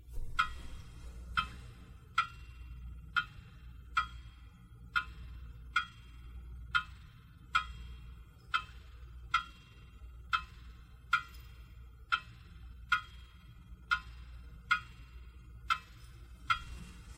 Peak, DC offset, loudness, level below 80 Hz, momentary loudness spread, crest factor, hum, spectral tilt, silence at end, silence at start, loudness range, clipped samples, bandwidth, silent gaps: -16 dBFS; under 0.1%; -36 LUFS; -50 dBFS; 20 LU; 26 dB; none; -2.5 dB/octave; 0 s; 0 s; 2 LU; under 0.1%; 16 kHz; none